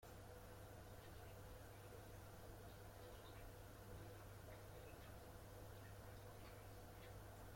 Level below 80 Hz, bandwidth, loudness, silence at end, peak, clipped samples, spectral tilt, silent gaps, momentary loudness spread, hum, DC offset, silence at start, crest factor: -66 dBFS; 16.5 kHz; -60 LUFS; 0 s; -46 dBFS; under 0.1%; -5 dB/octave; none; 1 LU; none; under 0.1%; 0 s; 14 dB